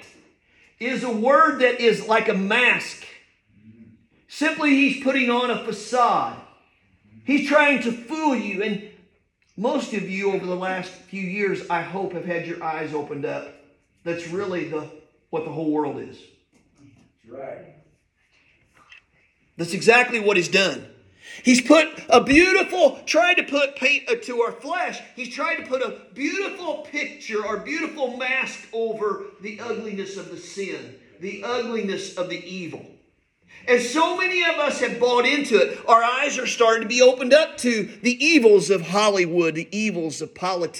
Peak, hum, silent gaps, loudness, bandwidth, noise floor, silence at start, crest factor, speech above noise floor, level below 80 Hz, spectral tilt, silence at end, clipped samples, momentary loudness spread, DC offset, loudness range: 0 dBFS; none; none; -21 LUFS; 17.5 kHz; -64 dBFS; 0 s; 22 dB; 43 dB; -60 dBFS; -3.5 dB/octave; 0 s; under 0.1%; 16 LU; under 0.1%; 12 LU